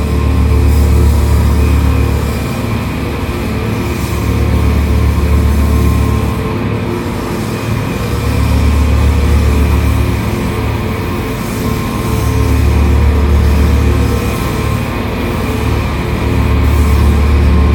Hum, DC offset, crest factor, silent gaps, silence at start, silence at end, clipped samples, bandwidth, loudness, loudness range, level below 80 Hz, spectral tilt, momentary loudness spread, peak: none; under 0.1%; 10 dB; none; 0 s; 0 s; under 0.1%; 18.5 kHz; -13 LUFS; 2 LU; -14 dBFS; -7 dB/octave; 6 LU; 0 dBFS